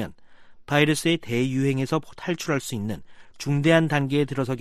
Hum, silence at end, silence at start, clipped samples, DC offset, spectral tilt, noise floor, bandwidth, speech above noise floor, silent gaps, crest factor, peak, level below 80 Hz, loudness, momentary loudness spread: none; 0 s; 0 s; under 0.1%; under 0.1%; -5.5 dB/octave; -46 dBFS; 14.5 kHz; 23 dB; none; 18 dB; -6 dBFS; -56 dBFS; -24 LUFS; 12 LU